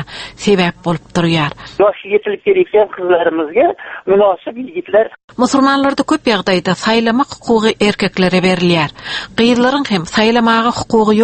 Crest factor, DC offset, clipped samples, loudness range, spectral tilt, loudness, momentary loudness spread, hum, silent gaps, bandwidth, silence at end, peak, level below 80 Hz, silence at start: 14 dB; under 0.1%; under 0.1%; 1 LU; -5.5 dB/octave; -14 LUFS; 7 LU; none; 5.24-5.28 s; 8.8 kHz; 0 s; 0 dBFS; -46 dBFS; 0 s